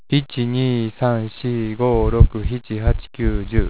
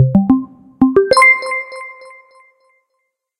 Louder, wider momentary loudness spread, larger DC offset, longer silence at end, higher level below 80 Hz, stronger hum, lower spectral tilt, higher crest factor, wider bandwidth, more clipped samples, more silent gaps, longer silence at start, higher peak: second, -20 LUFS vs -12 LUFS; second, 7 LU vs 22 LU; first, 1% vs under 0.1%; second, 0 s vs 1.5 s; first, -24 dBFS vs -46 dBFS; neither; first, -11.5 dB/octave vs -6 dB/octave; about the same, 18 dB vs 16 dB; second, 4 kHz vs 16 kHz; neither; neither; about the same, 0.1 s vs 0 s; about the same, 0 dBFS vs 0 dBFS